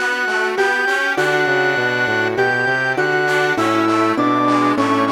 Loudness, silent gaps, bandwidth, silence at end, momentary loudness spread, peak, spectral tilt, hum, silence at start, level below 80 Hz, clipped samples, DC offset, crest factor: -16 LUFS; none; 17 kHz; 0 s; 1 LU; -4 dBFS; -4.5 dB/octave; none; 0 s; -62 dBFS; under 0.1%; under 0.1%; 12 dB